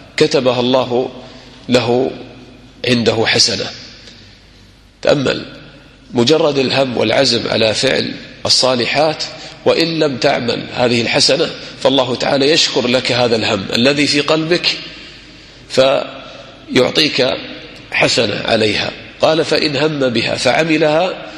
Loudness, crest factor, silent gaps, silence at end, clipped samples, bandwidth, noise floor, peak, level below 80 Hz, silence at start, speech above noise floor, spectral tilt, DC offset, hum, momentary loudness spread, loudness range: -14 LUFS; 16 dB; none; 0 s; under 0.1%; 13 kHz; -44 dBFS; 0 dBFS; -48 dBFS; 0 s; 30 dB; -3.5 dB/octave; under 0.1%; none; 12 LU; 3 LU